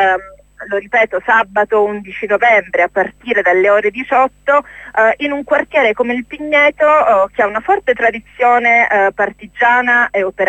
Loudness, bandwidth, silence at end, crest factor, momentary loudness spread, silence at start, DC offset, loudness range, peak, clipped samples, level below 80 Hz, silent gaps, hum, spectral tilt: -13 LUFS; 8.4 kHz; 0 s; 12 dB; 8 LU; 0 s; under 0.1%; 2 LU; 0 dBFS; under 0.1%; -50 dBFS; none; 50 Hz at -50 dBFS; -5 dB/octave